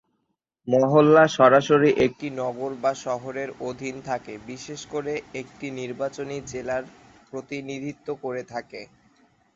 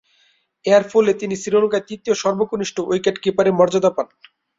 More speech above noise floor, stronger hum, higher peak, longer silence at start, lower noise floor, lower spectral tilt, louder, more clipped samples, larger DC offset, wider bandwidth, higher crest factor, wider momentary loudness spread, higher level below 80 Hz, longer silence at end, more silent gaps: first, 53 dB vs 43 dB; neither; about the same, -4 dBFS vs -2 dBFS; about the same, 0.65 s vs 0.65 s; first, -76 dBFS vs -61 dBFS; about the same, -6 dB/octave vs -5 dB/octave; second, -23 LUFS vs -18 LUFS; neither; neither; about the same, 7.8 kHz vs 7.8 kHz; about the same, 20 dB vs 16 dB; first, 21 LU vs 8 LU; about the same, -62 dBFS vs -60 dBFS; first, 0.7 s vs 0.55 s; neither